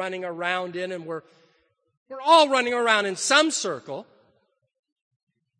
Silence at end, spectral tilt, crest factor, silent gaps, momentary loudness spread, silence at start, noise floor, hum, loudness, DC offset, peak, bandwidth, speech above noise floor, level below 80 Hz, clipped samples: 1.55 s; -2 dB/octave; 22 dB; 1.97-2.06 s; 19 LU; 0 s; -69 dBFS; none; -22 LUFS; under 0.1%; -2 dBFS; 10 kHz; 46 dB; -78 dBFS; under 0.1%